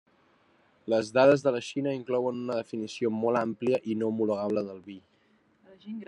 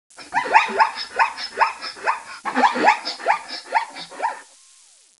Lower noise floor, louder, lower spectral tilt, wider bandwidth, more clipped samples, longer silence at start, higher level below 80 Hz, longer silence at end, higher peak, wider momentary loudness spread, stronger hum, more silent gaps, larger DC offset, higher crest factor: first, -66 dBFS vs -52 dBFS; second, -28 LUFS vs -21 LUFS; first, -6 dB/octave vs -1.5 dB/octave; about the same, 10.5 kHz vs 11.5 kHz; neither; first, 0.85 s vs 0.2 s; second, -76 dBFS vs -68 dBFS; second, 0.05 s vs 0.75 s; second, -8 dBFS vs 0 dBFS; first, 19 LU vs 11 LU; neither; neither; neither; about the same, 20 dB vs 22 dB